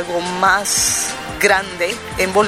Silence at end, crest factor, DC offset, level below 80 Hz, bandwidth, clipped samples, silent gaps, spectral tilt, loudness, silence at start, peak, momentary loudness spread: 0 s; 18 dB; under 0.1%; -42 dBFS; 16 kHz; under 0.1%; none; -1.5 dB/octave; -16 LUFS; 0 s; 0 dBFS; 7 LU